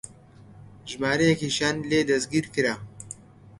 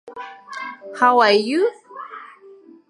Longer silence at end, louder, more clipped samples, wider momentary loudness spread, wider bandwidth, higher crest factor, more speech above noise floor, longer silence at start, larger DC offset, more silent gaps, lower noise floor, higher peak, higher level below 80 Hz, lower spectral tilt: second, 0.1 s vs 0.65 s; second, -24 LUFS vs -17 LUFS; neither; second, 19 LU vs 22 LU; about the same, 11.5 kHz vs 11.5 kHz; about the same, 20 dB vs 18 dB; about the same, 26 dB vs 29 dB; about the same, 0.05 s vs 0.05 s; neither; neither; first, -50 dBFS vs -46 dBFS; second, -6 dBFS vs -2 dBFS; first, -58 dBFS vs -80 dBFS; about the same, -4.5 dB/octave vs -4 dB/octave